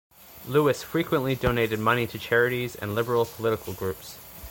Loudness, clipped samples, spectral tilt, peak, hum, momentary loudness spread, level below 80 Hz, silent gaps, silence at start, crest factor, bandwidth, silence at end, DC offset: -26 LUFS; under 0.1%; -5.5 dB/octave; -6 dBFS; none; 10 LU; -48 dBFS; none; 0.2 s; 20 dB; 17 kHz; 0 s; under 0.1%